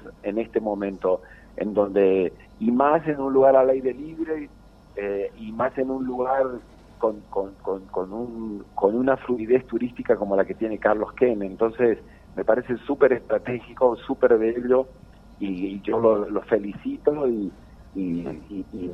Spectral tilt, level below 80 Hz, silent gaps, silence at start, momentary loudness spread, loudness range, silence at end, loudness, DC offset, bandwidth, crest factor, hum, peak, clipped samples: -9 dB/octave; -52 dBFS; none; 0 s; 12 LU; 6 LU; 0 s; -24 LUFS; under 0.1%; 5.8 kHz; 18 dB; none; -6 dBFS; under 0.1%